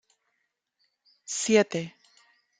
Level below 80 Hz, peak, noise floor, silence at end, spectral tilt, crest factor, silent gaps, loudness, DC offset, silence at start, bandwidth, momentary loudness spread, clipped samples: -76 dBFS; -8 dBFS; -79 dBFS; 0.7 s; -3.5 dB/octave; 22 dB; none; -26 LUFS; under 0.1%; 1.3 s; 9.6 kHz; 20 LU; under 0.1%